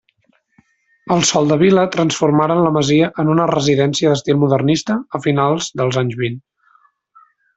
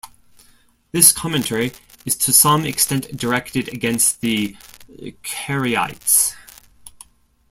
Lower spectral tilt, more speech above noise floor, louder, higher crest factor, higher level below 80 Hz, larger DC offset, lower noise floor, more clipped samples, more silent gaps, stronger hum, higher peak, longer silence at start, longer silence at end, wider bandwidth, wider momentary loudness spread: first, -5.5 dB/octave vs -2.5 dB/octave; first, 46 dB vs 35 dB; about the same, -15 LUFS vs -17 LUFS; second, 14 dB vs 20 dB; about the same, -54 dBFS vs -52 dBFS; neither; first, -61 dBFS vs -54 dBFS; neither; neither; neither; about the same, -2 dBFS vs 0 dBFS; first, 1.05 s vs 0.05 s; first, 1.15 s vs 0.6 s; second, 8.2 kHz vs 16.5 kHz; second, 6 LU vs 16 LU